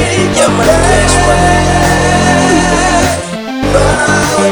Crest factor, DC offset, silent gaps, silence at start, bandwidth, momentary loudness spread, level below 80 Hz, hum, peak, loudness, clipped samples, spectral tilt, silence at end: 8 dB; under 0.1%; none; 0 s; over 20 kHz; 4 LU; -20 dBFS; none; 0 dBFS; -9 LUFS; 0.2%; -4 dB/octave; 0 s